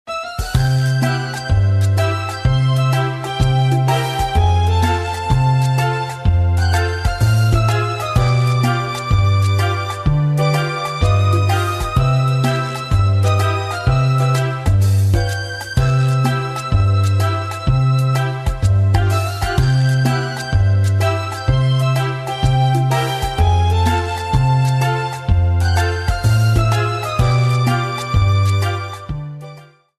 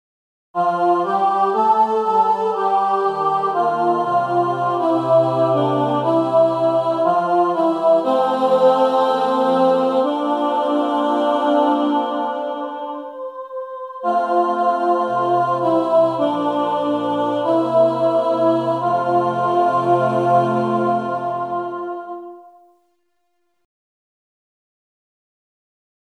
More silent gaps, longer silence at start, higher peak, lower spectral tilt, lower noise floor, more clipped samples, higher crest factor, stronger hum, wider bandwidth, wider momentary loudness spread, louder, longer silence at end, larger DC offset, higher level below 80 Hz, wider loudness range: neither; second, 0.05 s vs 0.55 s; first, 0 dBFS vs -4 dBFS; second, -6 dB/octave vs -7.5 dB/octave; second, -40 dBFS vs -71 dBFS; neither; about the same, 14 dB vs 16 dB; neither; first, 14 kHz vs 10 kHz; second, 5 LU vs 9 LU; about the same, -17 LUFS vs -18 LUFS; second, 0.35 s vs 3.7 s; neither; first, -26 dBFS vs -76 dBFS; second, 1 LU vs 5 LU